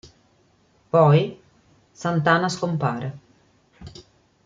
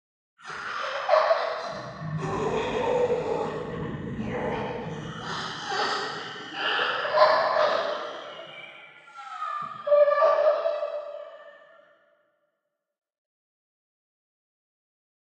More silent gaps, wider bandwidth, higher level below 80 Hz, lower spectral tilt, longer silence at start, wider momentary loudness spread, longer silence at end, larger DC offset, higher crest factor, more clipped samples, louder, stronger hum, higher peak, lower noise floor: neither; second, 7.6 kHz vs 8.8 kHz; about the same, -58 dBFS vs -58 dBFS; first, -6.5 dB/octave vs -4.5 dB/octave; first, 0.95 s vs 0.4 s; first, 24 LU vs 19 LU; second, 0.55 s vs 3.8 s; neither; about the same, 20 dB vs 24 dB; neither; first, -21 LUFS vs -26 LUFS; neither; about the same, -4 dBFS vs -4 dBFS; second, -61 dBFS vs -81 dBFS